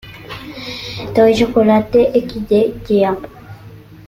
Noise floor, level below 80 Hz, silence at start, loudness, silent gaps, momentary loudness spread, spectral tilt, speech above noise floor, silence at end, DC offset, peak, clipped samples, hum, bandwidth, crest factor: -38 dBFS; -42 dBFS; 0.05 s; -14 LUFS; none; 18 LU; -6.5 dB/octave; 24 dB; 0.15 s; under 0.1%; -2 dBFS; under 0.1%; none; 15.5 kHz; 14 dB